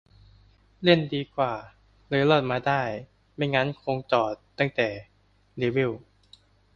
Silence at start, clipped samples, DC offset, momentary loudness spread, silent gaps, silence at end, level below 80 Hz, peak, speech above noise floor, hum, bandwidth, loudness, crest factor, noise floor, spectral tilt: 0.8 s; under 0.1%; under 0.1%; 16 LU; none; 0.8 s; -58 dBFS; -4 dBFS; 33 dB; 50 Hz at -60 dBFS; 7 kHz; -26 LUFS; 22 dB; -58 dBFS; -7 dB/octave